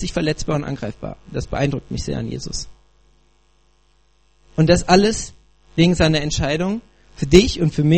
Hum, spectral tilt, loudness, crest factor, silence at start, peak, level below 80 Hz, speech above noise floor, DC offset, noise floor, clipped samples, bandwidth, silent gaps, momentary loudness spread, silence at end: 60 Hz at -45 dBFS; -5.5 dB/octave; -19 LUFS; 20 dB; 0 s; 0 dBFS; -34 dBFS; 41 dB; 0.3%; -59 dBFS; under 0.1%; 8.8 kHz; none; 16 LU; 0 s